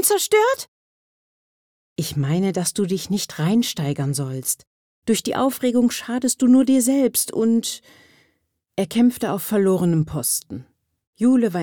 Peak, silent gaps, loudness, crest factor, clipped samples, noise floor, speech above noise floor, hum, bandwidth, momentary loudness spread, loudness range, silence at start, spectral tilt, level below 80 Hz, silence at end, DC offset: -6 dBFS; 0.68-1.96 s, 4.67-5.02 s, 11.07-11.13 s; -20 LUFS; 16 dB; under 0.1%; -69 dBFS; 50 dB; none; over 20 kHz; 11 LU; 4 LU; 0 s; -5 dB/octave; -58 dBFS; 0 s; under 0.1%